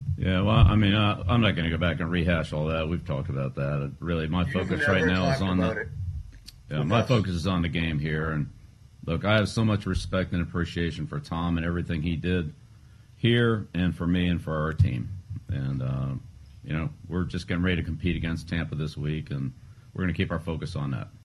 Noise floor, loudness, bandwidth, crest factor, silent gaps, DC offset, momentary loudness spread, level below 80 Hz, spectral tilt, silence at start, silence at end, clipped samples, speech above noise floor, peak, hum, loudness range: -51 dBFS; -27 LUFS; 11.5 kHz; 20 dB; none; under 0.1%; 11 LU; -40 dBFS; -7 dB/octave; 0 s; 0.1 s; under 0.1%; 25 dB; -6 dBFS; none; 4 LU